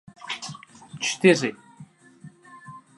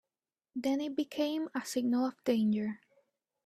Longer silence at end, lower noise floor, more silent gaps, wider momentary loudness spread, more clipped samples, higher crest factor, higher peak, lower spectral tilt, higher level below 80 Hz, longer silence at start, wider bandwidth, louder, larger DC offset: second, 0.2 s vs 0.7 s; second, -49 dBFS vs under -90 dBFS; neither; first, 26 LU vs 8 LU; neither; first, 24 dB vs 16 dB; first, -4 dBFS vs -18 dBFS; second, -4 dB/octave vs -5.5 dB/octave; first, -72 dBFS vs -78 dBFS; second, 0.25 s vs 0.55 s; second, 11.5 kHz vs 14 kHz; first, -23 LUFS vs -33 LUFS; neither